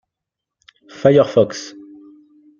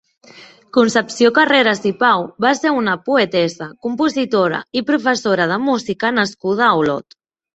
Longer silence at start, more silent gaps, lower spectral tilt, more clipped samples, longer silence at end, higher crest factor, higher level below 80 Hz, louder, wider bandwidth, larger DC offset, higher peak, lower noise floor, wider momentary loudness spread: first, 1.05 s vs 0.35 s; neither; first, -6.5 dB/octave vs -4.5 dB/octave; neither; first, 0.9 s vs 0.55 s; about the same, 20 dB vs 16 dB; about the same, -60 dBFS vs -60 dBFS; about the same, -15 LUFS vs -16 LUFS; second, 7.4 kHz vs 8.2 kHz; neither; about the same, 0 dBFS vs 0 dBFS; first, -83 dBFS vs -43 dBFS; first, 18 LU vs 6 LU